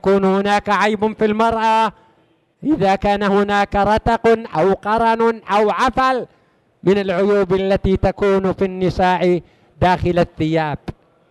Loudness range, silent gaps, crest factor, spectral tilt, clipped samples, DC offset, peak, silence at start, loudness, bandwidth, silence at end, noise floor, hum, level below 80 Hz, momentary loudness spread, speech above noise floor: 2 LU; none; 14 dB; -6.5 dB/octave; under 0.1%; under 0.1%; -4 dBFS; 0.05 s; -17 LUFS; 12 kHz; 0.4 s; -58 dBFS; none; -36 dBFS; 5 LU; 42 dB